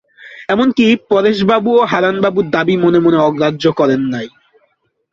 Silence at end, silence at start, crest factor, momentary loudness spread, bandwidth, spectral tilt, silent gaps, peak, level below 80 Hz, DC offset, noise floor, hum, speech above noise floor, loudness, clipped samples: 0.85 s; 0.25 s; 12 dB; 7 LU; 7.4 kHz; -7 dB/octave; none; 0 dBFS; -52 dBFS; under 0.1%; -61 dBFS; none; 49 dB; -13 LUFS; under 0.1%